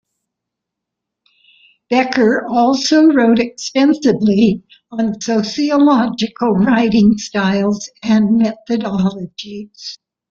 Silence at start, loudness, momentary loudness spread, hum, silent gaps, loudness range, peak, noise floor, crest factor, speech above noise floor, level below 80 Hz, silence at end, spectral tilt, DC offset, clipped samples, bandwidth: 1.9 s; -14 LUFS; 16 LU; none; none; 3 LU; -2 dBFS; -80 dBFS; 14 dB; 66 dB; -52 dBFS; 0.35 s; -5.5 dB/octave; under 0.1%; under 0.1%; 7.6 kHz